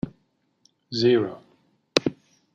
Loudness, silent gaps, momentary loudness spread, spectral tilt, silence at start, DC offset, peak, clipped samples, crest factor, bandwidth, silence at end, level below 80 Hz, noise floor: -24 LUFS; none; 14 LU; -5 dB/octave; 0.05 s; under 0.1%; 0 dBFS; under 0.1%; 26 dB; 11 kHz; 0.45 s; -60 dBFS; -69 dBFS